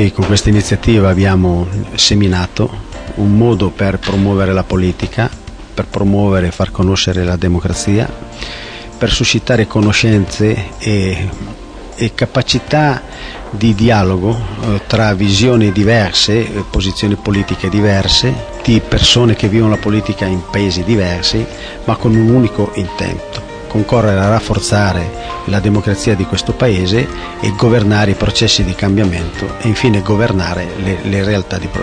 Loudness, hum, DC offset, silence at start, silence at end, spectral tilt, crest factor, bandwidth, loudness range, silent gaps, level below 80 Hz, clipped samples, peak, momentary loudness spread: -13 LUFS; none; under 0.1%; 0 s; 0 s; -5.5 dB/octave; 12 dB; 10.5 kHz; 3 LU; none; -28 dBFS; under 0.1%; 0 dBFS; 10 LU